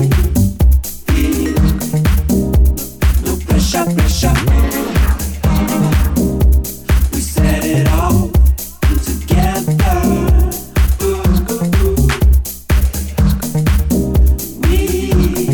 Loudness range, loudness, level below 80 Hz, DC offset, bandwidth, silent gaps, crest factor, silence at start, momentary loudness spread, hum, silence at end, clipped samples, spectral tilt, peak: 1 LU; -14 LUFS; -14 dBFS; under 0.1%; 20 kHz; none; 12 dB; 0 s; 4 LU; none; 0 s; under 0.1%; -6 dB/octave; 0 dBFS